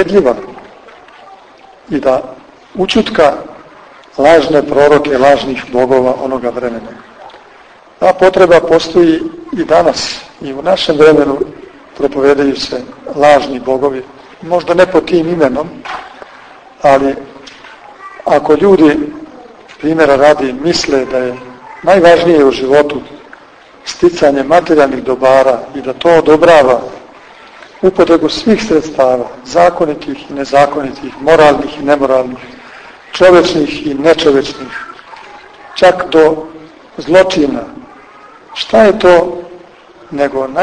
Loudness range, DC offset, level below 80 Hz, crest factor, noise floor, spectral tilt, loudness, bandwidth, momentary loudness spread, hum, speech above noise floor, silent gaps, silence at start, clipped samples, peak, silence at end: 3 LU; under 0.1%; -42 dBFS; 10 dB; -39 dBFS; -5 dB/octave; -10 LUFS; 10.5 kHz; 18 LU; none; 30 dB; none; 0 s; 2%; 0 dBFS; 0 s